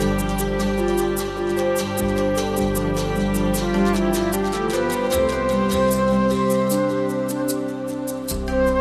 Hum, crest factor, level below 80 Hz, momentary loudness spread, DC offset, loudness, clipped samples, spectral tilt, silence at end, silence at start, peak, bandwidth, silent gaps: none; 14 dB; -34 dBFS; 5 LU; under 0.1%; -21 LUFS; under 0.1%; -5.5 dB/octave; 0 s; 0 s; -8 dBFS; 14 kHz; none